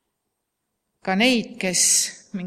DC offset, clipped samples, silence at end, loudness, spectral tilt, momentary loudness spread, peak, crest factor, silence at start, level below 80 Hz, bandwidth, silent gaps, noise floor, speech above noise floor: under 0.1%; under 0.1%; 0 s; -19 LUFS; -2 dB/octave; 10 LU; -6 dBFS; 18 dB; 1.05 s; -66 dBFS; 16 kHz; none; -78 dBFS; 58 dB